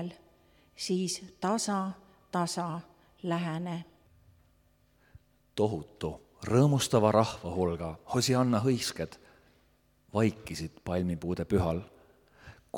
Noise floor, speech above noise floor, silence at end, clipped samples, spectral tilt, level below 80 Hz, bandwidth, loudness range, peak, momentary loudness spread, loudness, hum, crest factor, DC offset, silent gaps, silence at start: -67 dBFS; 37 dB; 0 s; under 0.1%; -5.5 dB/octave; -56 dBFS; 18 kHz; 9 LU; -8 dBFS; 14 LU; -31 LUFS; none; 22 dB; under 0.1%; none; 0 s